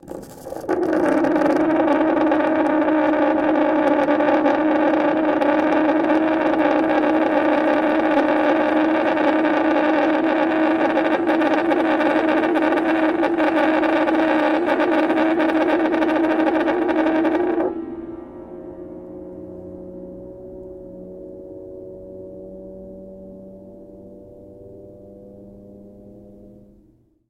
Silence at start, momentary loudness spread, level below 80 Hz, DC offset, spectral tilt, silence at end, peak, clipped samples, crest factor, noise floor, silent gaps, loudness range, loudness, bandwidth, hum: 0.05 s; 19 LU; -54 dBFS; under 0.1%; -6.5 dB/octave; 1.05 s; -2 dBFS; under 0.1%; 16 dB; -56 dBFS; none; 19 LU; -18 LUFS; 6.6 kHz; none